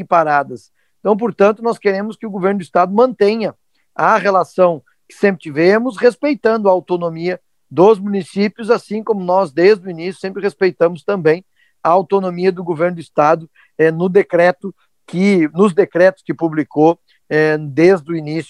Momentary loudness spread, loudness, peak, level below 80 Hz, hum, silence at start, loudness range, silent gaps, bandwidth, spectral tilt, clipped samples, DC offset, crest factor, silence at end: 10 LU; -15 LUFS; 0 dBFS; -64 dBFS; none; 0 s; 2 LU; none; 11.5 kHz; -7 dB/octave; under 0.1%; under 0.1%; 14 dB; 0.05 s